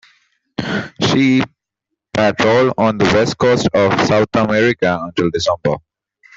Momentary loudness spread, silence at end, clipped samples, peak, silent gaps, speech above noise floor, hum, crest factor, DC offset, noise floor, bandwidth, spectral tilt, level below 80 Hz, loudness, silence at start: 9 LU; 0.6 s; under 0.1%; -2 dBFS; none; 64 dB; none; 14 dB; under 0.1%; -78 dBFS; 7.8 kHz; -5.5 dB/octave; -48 dBFS; -15 LUFS; 0.6 s